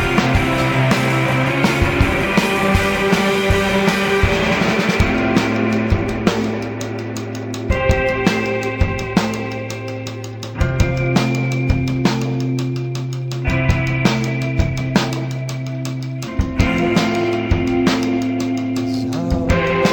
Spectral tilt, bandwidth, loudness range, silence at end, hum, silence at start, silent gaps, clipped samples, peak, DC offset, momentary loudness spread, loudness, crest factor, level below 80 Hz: -6 dB/octave; 18 kHz; 4 LU; 0 s; none; 0 s; none; under 0.1%; -2 dBFS; under 0.1%; 9 LU; -18 LUFS; 16 dB; -28 dBFS